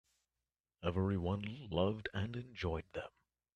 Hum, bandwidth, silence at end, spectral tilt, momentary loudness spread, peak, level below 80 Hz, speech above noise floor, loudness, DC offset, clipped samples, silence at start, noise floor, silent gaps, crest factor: none; 7 kHz; 0.45 s; -8 dB/octave; 9 LU; -20 dBFS; -60 dBFS; over 51 dB; -40 LUFS; under 0.1%; under 0.1%; 0.8 s; under -90 dBFS; none; 20 dB